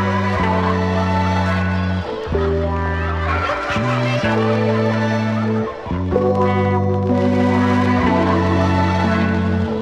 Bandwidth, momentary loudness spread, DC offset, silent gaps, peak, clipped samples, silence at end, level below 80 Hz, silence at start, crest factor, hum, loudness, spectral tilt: 8.6 kHz; 5 LU; under 0.1%; none; -2 dBFS; under 0.1%; 0 s; -34 dBFS; 0 s; 16 dB; none; -18 LUFS; -7.5 dB/octave